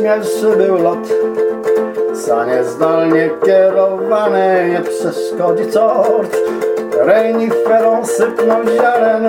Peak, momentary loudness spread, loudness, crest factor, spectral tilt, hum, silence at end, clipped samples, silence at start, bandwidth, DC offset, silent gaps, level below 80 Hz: 0 dBFS; 5 LU; -13 LUFS; 12 dB; -5.5 dB/octave; none; 0 s; under 0.1%; 0 s; 16.5 kHz; under 0.1%; none; -60 dBFS